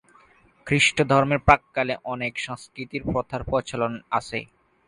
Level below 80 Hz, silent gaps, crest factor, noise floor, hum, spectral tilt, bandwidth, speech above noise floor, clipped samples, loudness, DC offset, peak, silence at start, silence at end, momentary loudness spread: -44 dBFS; none; 24 dB; -57 dBFS; none; -4.5 dB/octave; 11.5 kHz; 33 dB; under 0.1%; -23 LUFS; under 0.1%; 0 dBFS; 0.65 s; 0.4 s; 14 LU